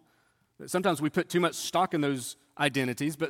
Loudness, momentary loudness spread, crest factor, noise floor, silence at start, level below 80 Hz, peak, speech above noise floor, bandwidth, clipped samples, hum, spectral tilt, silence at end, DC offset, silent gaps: -29 LUFS; 7 LU; 20 dB; -69 dBFS; 0.6 s; -72 dBFS; -10 dBFS; 40 dB; 17.5 kHz; under 0.1%; none; -4.5 dB/octave; 0 s; under 0.1%; none